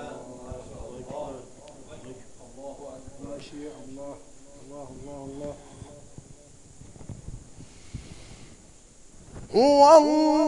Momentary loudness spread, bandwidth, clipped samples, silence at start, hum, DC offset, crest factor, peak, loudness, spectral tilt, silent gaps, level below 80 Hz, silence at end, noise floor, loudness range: 29 LU; 11 kHz; under 0.1%; 0 s; none; under 0.1%; 24 dB; -4 dBFS; -19 LUFS; -5 dB/octave; none; -52 dBFS; 0 s; -51 dBFS; 23 LU